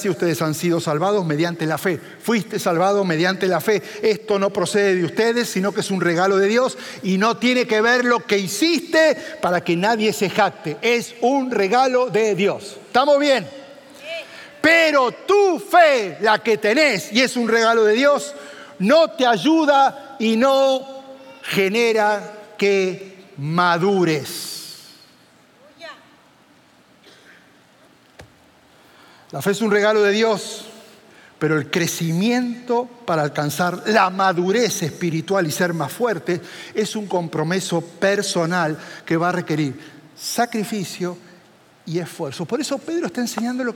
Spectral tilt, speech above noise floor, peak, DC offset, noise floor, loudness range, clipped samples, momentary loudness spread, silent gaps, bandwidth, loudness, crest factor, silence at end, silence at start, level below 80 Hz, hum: -4.5 dB/octave; 34 dB; -2 dBFS; under 0.1%; -53 dBFS; 7 LU; under 0.1%; 13 LU; none; 17 kHz; -19 LUFS; 18 dB; 0 s; 0 s; -70 dBFS; none